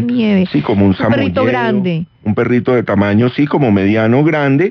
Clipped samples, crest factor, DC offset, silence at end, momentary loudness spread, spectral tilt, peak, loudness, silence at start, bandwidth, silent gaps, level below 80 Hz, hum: under 0.1%; 12 dB; under 0.1%; 0 s; 4 LU; -9 dB/octave; 0 dBFS; -13 LUFS; 0 s; 6.2 kHz; none; -48 dBFS; none